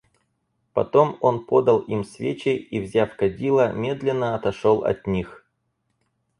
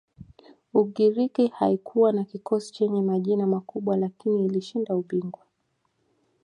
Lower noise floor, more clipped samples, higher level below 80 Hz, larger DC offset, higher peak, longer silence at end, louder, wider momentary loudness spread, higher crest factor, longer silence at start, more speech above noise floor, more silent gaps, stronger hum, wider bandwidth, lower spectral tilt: about the same, -73 dBFS vs -74 dBFS; neither; first, -52 dBFS vs -68 dBFS; neither; first, -4 dBFS vs -8 dBFS; about the same, 1.05 s vs 1.1 s; first, -22 LUFS vs -25 LUFS; first, 9 LU vs 6 LU; about the same, 20 dB vs 18 dB; first, 0.75 s vs 0.2 s; about the same, 52 dB vs 49 dB; neither; neither; about the same, 11 kHz vs 10.5 kHz; about the same, -7.5 dB/octave vs -8.5 dB/octave